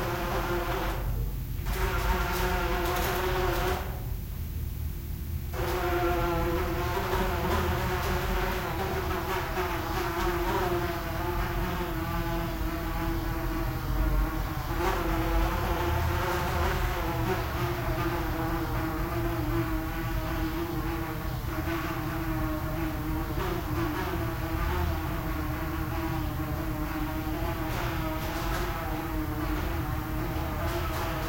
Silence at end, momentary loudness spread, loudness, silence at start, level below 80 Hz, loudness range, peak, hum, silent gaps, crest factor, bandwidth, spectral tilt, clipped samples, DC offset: 0 s; 4 LU; -31 LUFS; 0 s; -34 dBFS; 3 LU; -14 dBFS; none; none; 14 dB; 16.5 kHz; -6 dB/octave; under 0.1%; 0.2%